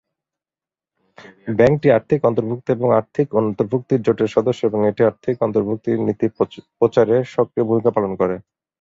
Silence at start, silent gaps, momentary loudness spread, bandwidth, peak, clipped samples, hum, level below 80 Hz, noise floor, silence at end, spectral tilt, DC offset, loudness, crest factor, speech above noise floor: 1.2 s; none; 6 LU; 7.6 kHz; -2 dBFS; under 0.1%; none; -54 dBFS; under -90 dBFS; 0.4 s; -8.5 dB/octave; under 0.1%; -18 LUFS; 18 dB; over 72 dB